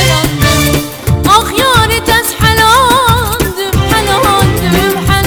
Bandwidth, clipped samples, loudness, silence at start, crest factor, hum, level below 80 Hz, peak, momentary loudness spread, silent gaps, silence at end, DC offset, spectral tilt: over 20 kHz; under 0.1%; -9 LUFS; 0 s; 10 dB; none; -22 dBFS; 0 dBFS; 7 LU; none; 0 s; under 0.1%; -4 dB/octave